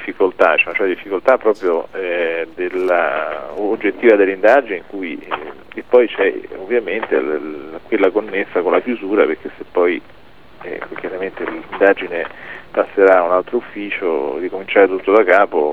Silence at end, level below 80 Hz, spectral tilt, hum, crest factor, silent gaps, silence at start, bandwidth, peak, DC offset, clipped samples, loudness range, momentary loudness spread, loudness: 0 s; -56 dBFS; -6 dB/octave; none; 16 dB; none; 0 s; 6.4 kHz; 0 dBFS; 0.8%; under 0.1%; 4 LU; 14 LU; -16 LUFS